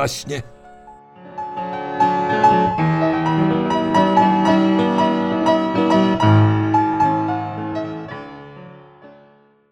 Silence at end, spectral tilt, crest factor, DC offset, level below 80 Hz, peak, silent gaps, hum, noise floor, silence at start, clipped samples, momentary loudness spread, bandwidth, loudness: 0.6 s; -7 dB/octave; 16 dB; under 0.1%; -52 dBFS; -2 dBFS; none; none; -52 dBFS; 0 s; under 0.1%; 15 LU; 13 kHz; -17 LUFS